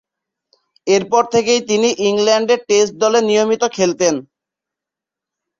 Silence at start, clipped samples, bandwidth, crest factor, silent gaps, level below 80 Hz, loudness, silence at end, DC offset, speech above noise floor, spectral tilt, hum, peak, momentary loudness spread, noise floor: 0.85 s; under 0.1%; 7.8 kHz; 16 dB; none; -60 dBFS; -15 LUFS; 1.4 s; under 0.1%; 71 dB; -3 dB/octave; none; -2 dBFS; 3 LU; -86 dBFS